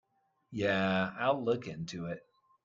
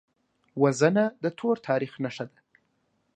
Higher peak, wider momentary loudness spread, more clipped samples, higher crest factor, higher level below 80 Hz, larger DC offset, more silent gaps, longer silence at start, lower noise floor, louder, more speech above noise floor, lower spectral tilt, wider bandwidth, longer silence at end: second, -14 dBFS vs -6 dBFS; second, 13 LU vs 16 LU; neither; about the same, 20 dB vs 22 dB; first, -70 dBFS vs -76 dBFS; neither; neither; about the same, 0.5 s vs 0.55 s; second, -63 dBFS vs -72 dBFS; second, -33 LUFS vs -26 LUFS; second, 31 dB vs 47 dB; about the same, -6 dB/octave vs -6 dB/octave; second, 7.6 kHz vs 9.4 kHz; second, 0.45 s vs 0.9 s